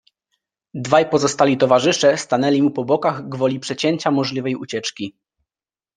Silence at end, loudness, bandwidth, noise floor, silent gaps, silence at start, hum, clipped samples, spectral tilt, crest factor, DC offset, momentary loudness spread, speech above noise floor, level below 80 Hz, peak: 0.85 s; -18 LUFS; 10 kHz; under -90 dBFS; none; 0.75 s; none; under 0.1%; -4.5 dB/octave; 18 dB; under 0.1%; 11 LU; over 72 dB; -62 dBFS; 0 dBFS